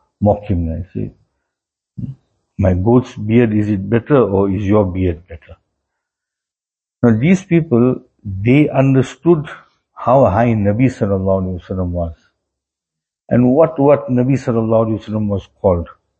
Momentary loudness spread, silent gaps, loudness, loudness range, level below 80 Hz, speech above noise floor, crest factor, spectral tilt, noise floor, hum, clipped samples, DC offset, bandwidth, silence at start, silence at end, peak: 12 LU; none; -15 LUFS; 4 LU; -40 dBFS; 75 dB; 16 dB; -9 dB/octave; -89 dBFS; none; under 0.1%; under 0.1%; 8.4 kHz; 0.2 s; 0.3 s; 0 dBFS